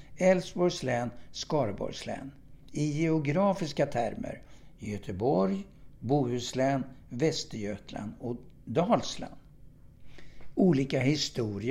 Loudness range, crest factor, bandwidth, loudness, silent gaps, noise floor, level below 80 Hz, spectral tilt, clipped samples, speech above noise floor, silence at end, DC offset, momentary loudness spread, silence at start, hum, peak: 3 LU; 18 dB; 13 kHz; -30 LUFS; none; -52 dBFS; -56 dBFS; -6 dB/octave; under 0.1%; 22 dB; 0 s; under 0.1%; 15 LU; 0 s; none; -12 dBFS